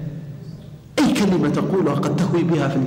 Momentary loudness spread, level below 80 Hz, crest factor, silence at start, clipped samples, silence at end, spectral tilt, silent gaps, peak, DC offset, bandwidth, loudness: 18 LU; -50 dBFS; 12 dB; 0 s; under 0.1%; 0 s; -6.5 dB/octave; none; -8 dBFS; under 0.1%; 16 kHz; -19 LUFS